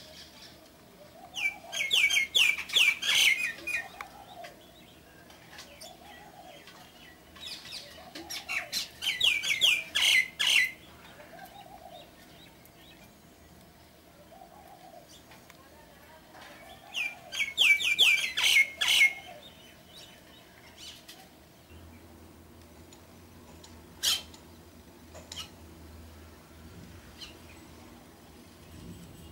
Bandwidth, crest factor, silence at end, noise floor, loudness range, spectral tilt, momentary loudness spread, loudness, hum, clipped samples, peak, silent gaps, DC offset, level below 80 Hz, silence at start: 16 kHz; 22 dB; 0.05 s; -56 dBFS; 23 LU; 0.5 dB/octave; 27 LU; -25 LUFS; none; under 0.1%; -12 dBFS; none; under 0.1%; -62 dBFS; 0 s